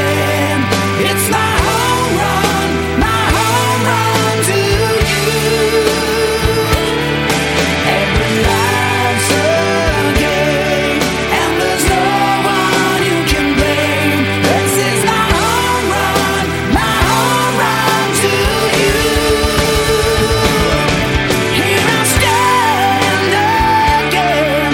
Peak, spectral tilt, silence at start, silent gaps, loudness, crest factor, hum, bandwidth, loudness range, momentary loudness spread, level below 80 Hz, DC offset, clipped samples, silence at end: 0 dBFS; -4 dB/octave; 0 s; none; -12 LUFS; 12 dB; none; 17 kHz; 1 LU; 2 LU; -26 dBFS; under 0.1%; under 0.1%; 0 s